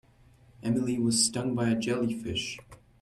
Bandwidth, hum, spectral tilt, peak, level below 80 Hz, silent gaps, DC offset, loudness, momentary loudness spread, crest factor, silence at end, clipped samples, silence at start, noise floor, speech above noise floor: 14 kHz; none; -4 dB/octave; -10 dBFS; -60 dBFS; none; under 0.1%; -28 LUFS; 12 LU; 20 dB; 0.25 s; under 0.1%; 0.6 s; -59 dBFS; 30 dB